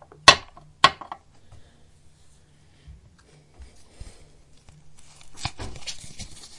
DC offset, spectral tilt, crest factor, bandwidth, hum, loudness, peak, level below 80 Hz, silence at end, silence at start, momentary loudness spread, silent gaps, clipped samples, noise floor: under 0.1%; -1 dB/octave; 28 dB; 12 kHz; none; -21 LUFS; 0 dBFS; -50 dBFS; 0.1 s; 0.25 s; 25 LU; none; under 0.1%; -55 dBFS